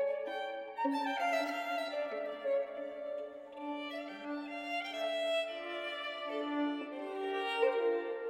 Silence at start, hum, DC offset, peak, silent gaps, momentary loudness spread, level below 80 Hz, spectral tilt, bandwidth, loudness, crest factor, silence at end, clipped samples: 0 s; none; under 0.1%; -18 dBFS; none; 9 LU; -82 dBFS; -2.5 dB/octave; 16 kHz; -37 LUFS; 18 dB; 0 s; under 0.1%